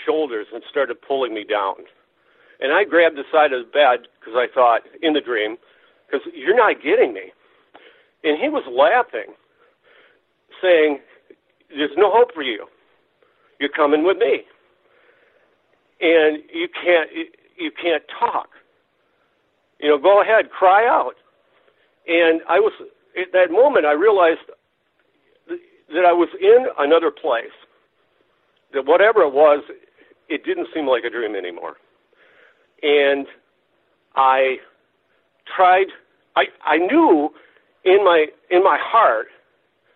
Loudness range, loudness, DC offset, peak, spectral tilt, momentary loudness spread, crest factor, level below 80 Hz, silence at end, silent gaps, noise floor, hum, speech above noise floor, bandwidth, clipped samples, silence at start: 5 LU; -18 LUFS; under 0.1%; -4 dBFS; -7.5 dB/octave; 14 LU; 16 dB; -72 dBFS; 0.7 s; none; -66 dBFS; none; 49 dB; 4.2 kHz; under 0.1%; 0 s